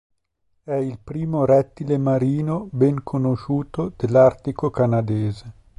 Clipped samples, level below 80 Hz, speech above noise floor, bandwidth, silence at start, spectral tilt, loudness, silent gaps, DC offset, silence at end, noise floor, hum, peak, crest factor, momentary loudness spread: under 0.1%; -50 dBFS; 51 dB; 10.5 kHz; 0.65 s; -10 dB/octave; -21 LUFS; none; under 0.1%; 0.3 s; -71 dBFS; none; -4 dBFS; 18 dB; 11 LU